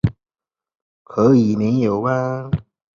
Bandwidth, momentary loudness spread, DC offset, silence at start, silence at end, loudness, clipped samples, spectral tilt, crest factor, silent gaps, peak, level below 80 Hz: 7.2 kHz; 12 LU; under 0.1%; 0.05 s; 0.35 s; -18 LUFS; under 0.1%; -9 dB/octave; 16 dB; 0.75-1.05 s; -2 dBFS; -42 dBFS